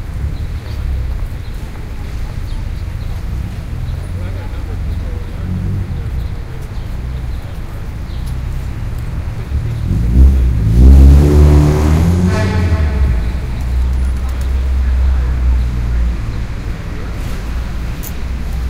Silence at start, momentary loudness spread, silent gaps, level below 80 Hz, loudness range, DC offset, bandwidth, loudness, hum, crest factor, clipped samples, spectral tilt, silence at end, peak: 0 s; 15 LU; none; -14 dBFS; 13 LU; under 0.1%; 15.5 kHz; -16 LUFS; none; 14 dB; 0.3%; -7.5 dB/octave; 0 s; 0 dBFS